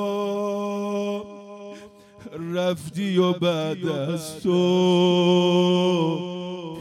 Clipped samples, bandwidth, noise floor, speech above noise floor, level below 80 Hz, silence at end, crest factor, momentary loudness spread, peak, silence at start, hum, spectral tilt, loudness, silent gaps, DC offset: under 0.1%; 13.5 kHz; -45 dBFS; 24 dB; -68 dBFS; 0 s; 14 dB; 17 LU; -8 dBFS; 0 s; none; -6.5 dB/octave; -23 LUFS; none; under 0.1%